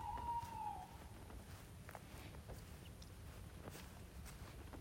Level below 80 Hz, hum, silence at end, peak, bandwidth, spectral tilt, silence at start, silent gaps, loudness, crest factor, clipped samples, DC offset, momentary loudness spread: -60 dBFS; none; 0 s; -36 dBFS; 16 kHz; -5 dB/octave; 0 s; none; -53 LUFS; 16 dB; under 0.1%; under 0.1%; 11 LU